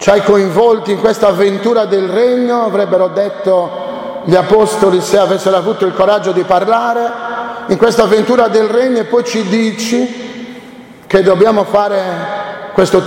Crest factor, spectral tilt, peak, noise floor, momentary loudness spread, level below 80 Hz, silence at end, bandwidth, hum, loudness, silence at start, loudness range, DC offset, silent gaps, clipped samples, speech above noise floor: 12 dB; -5.5 dB/octave; 0 dBFS; -34 dBFS; 11 LU; -46 dBFS; 0 s; 16.5 kHz; none; -12 LUFS; 0 s; 2 LU; under 0.1%; none; under 0.1%; 23 dB